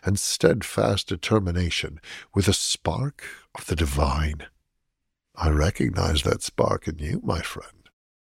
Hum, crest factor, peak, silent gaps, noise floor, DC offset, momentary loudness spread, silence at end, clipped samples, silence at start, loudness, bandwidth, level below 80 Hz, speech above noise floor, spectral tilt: none; 22 dB; -4 dBFS; none; -78 dBFS; under 0.1%; 13 LU; 0.55 s; under 0.1%; 0.05 s; -25 LUFS; 16 kHz; -34 dBFS; 54 dB; -4.5 dB/octave